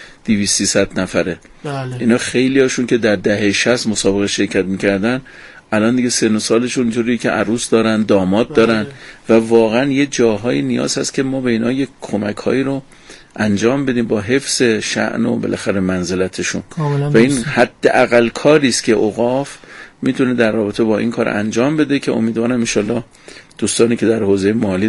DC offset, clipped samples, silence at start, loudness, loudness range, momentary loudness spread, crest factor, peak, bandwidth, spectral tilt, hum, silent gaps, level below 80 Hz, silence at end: under 0.1%; under 0.1%; 0 s; -15 LUFS; 3 LU; 8 LU; 16 dB; 0 dBFS; 11.5 kHz; -4.5 dB/octave; none; none; -46 dBFS; 0 s